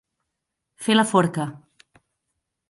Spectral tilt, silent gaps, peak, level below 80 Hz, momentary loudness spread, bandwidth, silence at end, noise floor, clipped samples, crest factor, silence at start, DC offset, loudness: -5 dB/octave; none; -4 dBFS; -66 dBFS; 13 LU; 11.5 kHz; 1.15 s; -81 dBFS; under 0.1%; 22 dB; 0.8 s; under 0.1%; -21 LUFS